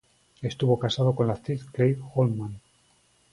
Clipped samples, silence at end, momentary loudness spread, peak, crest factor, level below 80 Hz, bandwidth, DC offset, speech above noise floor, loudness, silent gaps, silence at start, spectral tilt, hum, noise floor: under 0.1%; 0.75 s; 11 LU; -8 dBFS; 18 dB; -58 dBFS; 11 kHz; under 0.1%; 39 dB; -26 LUFS; none; 0.4 s; -7.5 dB/octave; none; -64 dBFS